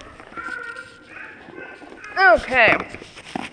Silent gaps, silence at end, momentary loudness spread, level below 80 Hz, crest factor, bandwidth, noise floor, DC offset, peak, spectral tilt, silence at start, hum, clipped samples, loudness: none; 0.05 s; 23 LU; -50 dBFS; 20 dB; 10.5 kHz; -40 dBFS; under 0.1%; -2 dBFS; -4 dB/octave; 0 s; none; under 0.1%; -17 LUFS